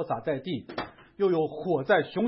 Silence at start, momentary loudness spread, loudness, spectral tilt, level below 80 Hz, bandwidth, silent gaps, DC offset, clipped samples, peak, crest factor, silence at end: 0 s; 13 LU; -28 LUFS; -10.5 dB/octave; -64 dBFS; 5.8 kHz; none; under 0.1%; under 0.1%; -10 dBFS; 18 dB; 0 s